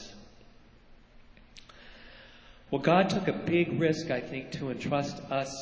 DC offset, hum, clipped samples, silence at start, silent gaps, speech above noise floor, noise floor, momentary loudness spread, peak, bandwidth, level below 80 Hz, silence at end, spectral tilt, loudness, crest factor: under 0.1%; none; under 0.1%; 0 s; none; 27 dB; -55 dBFS; 26 LU; -10 dBFS; 8 kHz; -58 dBFS; 0 s; -6 dB/octave; -29 LUFS; 22 dB